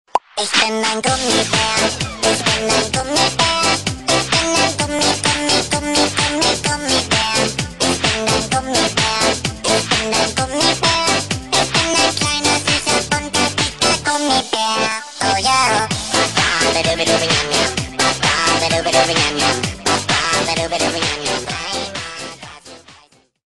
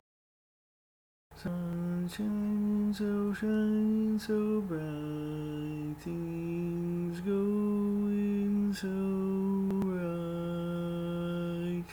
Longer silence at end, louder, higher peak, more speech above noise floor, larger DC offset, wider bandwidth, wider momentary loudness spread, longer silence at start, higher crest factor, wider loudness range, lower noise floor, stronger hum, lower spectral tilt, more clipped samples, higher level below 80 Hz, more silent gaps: first, 0.6 s vs 0 s; first, -15 LUFS vs -33 LUFS; first, 0 dBFS vs -22 dBFS; second, 33 dB vs over 58 dB; first, 0.5% vs under 0.1%; second, 12.5 kHz vs 19 kHz; about the same, 5 LU vs 7 LU; second, 0.15 s vs 1.3 s; first, 18 dB vs 10 dB; about the same, 1 LU vs 3 LU; second, -50 dBFS vs under -90 dBFS; neither; second, -2.5 dB/octave vs -8 dB/octave; neither; first, -40 dBFS vs -58 dBFS; neither